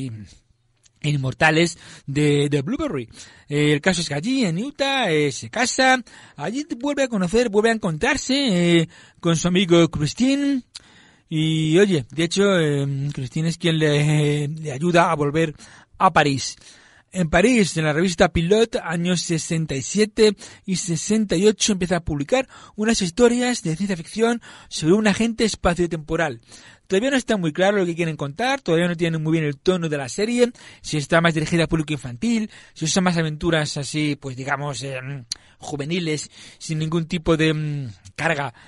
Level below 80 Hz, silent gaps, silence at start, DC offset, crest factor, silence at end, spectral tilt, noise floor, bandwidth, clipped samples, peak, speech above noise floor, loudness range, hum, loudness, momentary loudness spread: -46 dBFS; none; 0 s; under 0.1%; 18 dB; 0.15 s; -5 dB/octave; -60 dBFS; 11.5 kHz; under 0.1%; -2 dBFS; 40 dB; 4 LU; none; -21 LUFS; 11 LU